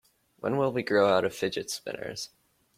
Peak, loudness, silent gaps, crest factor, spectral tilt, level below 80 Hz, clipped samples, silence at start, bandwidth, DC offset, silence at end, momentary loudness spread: -10 dBFS; -28 LUFS; none; 20 dB; -4.5 dB/octave; -68 dBFS; under 0.1%; 0.45 s; 16 kHz; under 0.1%; 0.5 s; 14 LU